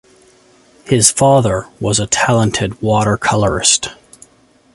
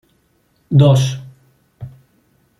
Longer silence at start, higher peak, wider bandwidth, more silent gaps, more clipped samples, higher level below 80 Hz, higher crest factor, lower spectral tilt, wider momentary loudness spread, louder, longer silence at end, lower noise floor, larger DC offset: first, 0.85 s vs 0.7 s; about the same, 0 dBFS vs -2 dBFS; first, 16 kHz vs 12 kHz; neither; neither; first, -40 dBFS vs -52 dBFS; about the same, 16 dB vs 16 dB; second, -3.5 dB/octave vs -7 dB/octave; second, 7 LU vs 25 LU; about the same, -13 LUFS vs -14 LUFS; about the same, 0.8 s vs 0.7 s; second, -51 dBFS vs -60 dBFS; neither